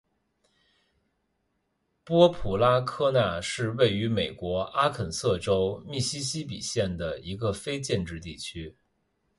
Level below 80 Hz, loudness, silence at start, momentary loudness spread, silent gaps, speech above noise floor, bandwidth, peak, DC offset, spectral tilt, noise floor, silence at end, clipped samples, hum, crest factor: -50 dBFS; -27 LUFS; 2.05 s; 12 LU; none; 49 dB; 11.5 kHz; -6 dBFS; under 0.1%; -5 dB/octave; -76 dBFS; 0.65 s; under 0.1%; none; 22 dB